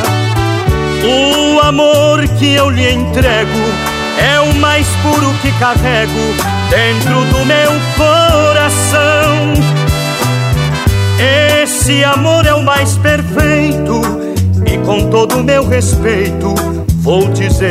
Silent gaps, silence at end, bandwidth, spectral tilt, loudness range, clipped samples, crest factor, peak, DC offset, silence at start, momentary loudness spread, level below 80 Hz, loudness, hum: none; 0 s; 16 kHz; -5 dB/octave; 2 LU; 0.3%; 10 dB; 0 dBFS; under 0.1%; 0 s; 5 LU; -22 dBFS; -10 LUFS; none